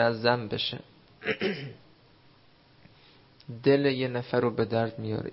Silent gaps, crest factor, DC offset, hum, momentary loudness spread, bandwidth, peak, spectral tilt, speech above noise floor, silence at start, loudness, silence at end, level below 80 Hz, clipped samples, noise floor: none; 22 dB; under 0.1%; none; 14 LU; 5.8 kHz; -8 dBFS; -10 dB/octave; 32 dB; 0 s; -28 LUFS; 0 s; -64 dBFS; under 0.1%; -59 dBFS